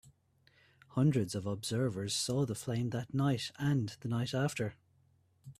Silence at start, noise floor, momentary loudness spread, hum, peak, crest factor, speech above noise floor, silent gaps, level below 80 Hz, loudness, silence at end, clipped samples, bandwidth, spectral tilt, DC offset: 0.9 s; -70 dBFS; 6 LU; none; -18 dBFS; 16 dB; 36 dB; none; -68 dBFS; -34 LUFS; 0.05 s; under 0.1%; 14.5 kHz; -5.5 dB/octave; under 0.1%